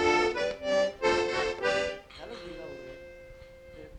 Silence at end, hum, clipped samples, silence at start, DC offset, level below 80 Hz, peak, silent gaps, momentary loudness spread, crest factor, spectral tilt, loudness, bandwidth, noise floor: 0 s; none; under 0.1%; 0 s; under 0.1%; -54 dBFS; -14 dBFS; none; 22 LU; 18 dB; -3.5 dB/octave; -28 LUFS; 10.5 kHz; -49 dBFS